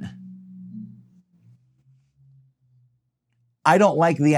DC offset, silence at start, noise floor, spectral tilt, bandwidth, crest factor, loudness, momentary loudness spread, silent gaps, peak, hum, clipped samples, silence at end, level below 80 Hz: under 0.1%; 0 s; -71 dBFS; -6.5 dB/octave; 13.5 kHz; 22 dB; -18 LUFS; 26 LU; none; -2 dBFS; none; under 0.1%; 0 s; -76 dBFS